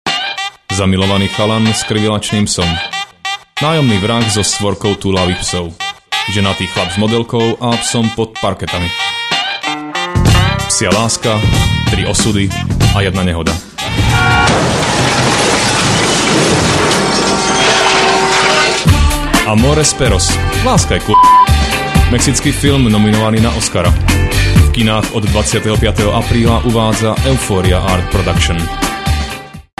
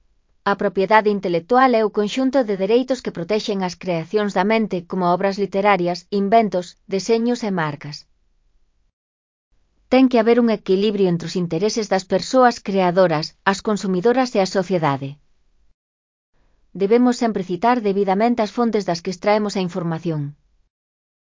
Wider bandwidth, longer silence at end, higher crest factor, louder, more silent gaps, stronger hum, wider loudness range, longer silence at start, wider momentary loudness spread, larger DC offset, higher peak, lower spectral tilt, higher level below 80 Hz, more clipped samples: first, 13 kHz vs 7.6 kHz; second, 0.2 s vs 0.95 s; second, 12 dB vs 20 dB; first, -12 LUFS vs -19 LUFS; second, none vs 8.93-9.51 s, 15.74-16.33 s; neither; about the same, 4 LU vs 4 LU; second, 0.05 s vs 0.45 s; about the same, 7 LU vs 9 LU; neither; about the same, 0 dBFS vs 0 dBFS; second, -4 dB/octave vs -6 dB/octave; first, -22 dBFS vs -58 dBFS; neither